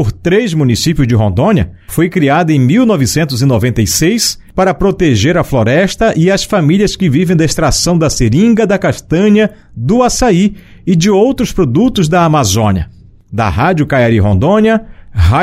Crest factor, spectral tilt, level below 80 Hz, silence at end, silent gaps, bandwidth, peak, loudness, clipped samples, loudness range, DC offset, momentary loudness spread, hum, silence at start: 10 dB; -5.5 dB/octave; -28 dBFS; 0 s; none; 16 kHz; 0 dBFS; -11 LUFS; under 0.1%; 1 LU; under 0.1%; 5 LU; none; 0 s